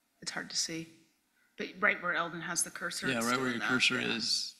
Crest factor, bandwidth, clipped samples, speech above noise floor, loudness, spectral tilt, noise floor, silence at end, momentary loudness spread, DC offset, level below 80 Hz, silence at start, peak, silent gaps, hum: 22 dB; 15.5 kHz; under 0.1%; 39 dB; -31 LUFS; -2 dB/octave; -72 dBFS; 0.05 s; 13 LU; under 0.1%; -72 dBFS; 0.2 s; -12 dBFS; none; none